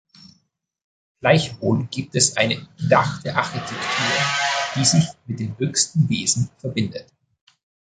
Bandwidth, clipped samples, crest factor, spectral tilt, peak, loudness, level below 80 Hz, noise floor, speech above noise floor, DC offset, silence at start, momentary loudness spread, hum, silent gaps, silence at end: 9.6 kHz; under 0.1%; 20 dB; -3.5 dB/octave; -2 dBFS; -20 LUFS; -54 dBFS; -67 dBFS; 46 dB; under 0.1%; 1.25 s; 9 LU; none; none; 0.85 s